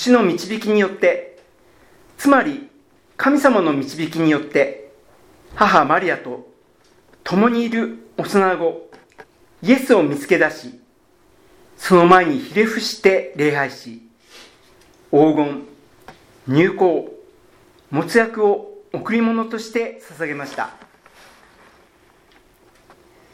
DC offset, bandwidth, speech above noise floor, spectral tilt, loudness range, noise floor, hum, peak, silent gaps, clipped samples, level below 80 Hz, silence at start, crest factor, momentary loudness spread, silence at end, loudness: under 0.1%; 16.5 kHz; 39 dB; -5.5 dB/octave; 6 LU; -56 dBFS; none; 0 dBFS; none; under 0.1%; -58 dBFS; 0 s; 20 dB; 15 LU; 2.6 s; -18 LUFS